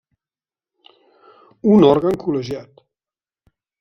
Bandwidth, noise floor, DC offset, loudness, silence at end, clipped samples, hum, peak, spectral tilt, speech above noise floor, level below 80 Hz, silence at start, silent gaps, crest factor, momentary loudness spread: 6.6 kHz; under -90 dBFS; under 0.1%; -16 LUFS; 1.2 s; under 0.1%; none; -2 dBFS; -8.5 dB/octave; over 75 dB; -56 dBFS; 1.65 s; none; 20 dB; 16 LU